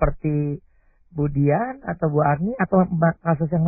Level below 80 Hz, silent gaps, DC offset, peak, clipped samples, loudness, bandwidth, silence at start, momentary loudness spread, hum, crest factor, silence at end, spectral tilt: -38 dBFS; none; under 0.1%; -6 dBFS; under 0.1%; -22 LUFS; 2.7 kHz; 0 s; 8 LU; none; 16 dB; 0 s; -16.5 dB/octave